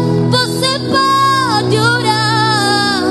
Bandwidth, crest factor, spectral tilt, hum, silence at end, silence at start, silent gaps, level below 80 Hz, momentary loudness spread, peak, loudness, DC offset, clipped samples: 12.5 kHz; 12 dB; -4.5 dB/octave; none; 0 s; 0 s; none; -50 dBFS; 2 LU; 0 dBFS; -12 LUFS; under 0.1%; under 0.1%